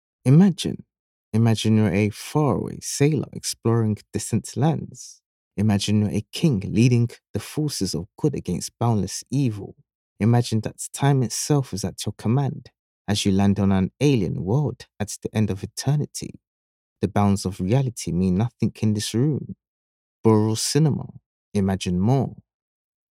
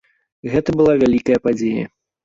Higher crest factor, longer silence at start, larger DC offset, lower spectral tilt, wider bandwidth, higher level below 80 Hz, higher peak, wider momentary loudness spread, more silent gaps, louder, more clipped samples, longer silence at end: about the same, 18 dB vs 14 dB; second, 0.25 s vs 0.45 s; neither; second, -6 dB/octave vs -7.5 dB/octave; first, 16 kHz vs 7.8 kHz; second, -54 dBFS vs -46 dBFS; about the same, -4 dBFS vs -4 dBFS; about the same, 11 LU vs 13 LU; first, 0.99-1.32 s, 5.26-5.51 s, 7.29-7.34 s, 9.95-10.16 s, 12.79-13.05 s, 16.47-16.96 s, 19.68-20.24 s, 21.26-21.52 s vs none; second, -23 LUFS vs -17 LUFS; neither; first, 0.75 s vs 0.4 s